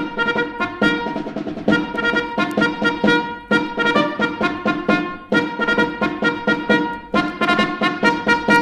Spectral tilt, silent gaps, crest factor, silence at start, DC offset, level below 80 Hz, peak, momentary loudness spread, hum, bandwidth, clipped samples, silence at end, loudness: -5.5 dB/octave; none; 18 dB; 0 s; under 0.1%; -48 dBFS; -2 dBFS; 4 LU; none; 13 kHz; under 0.1%; 0 s; -19 LUFS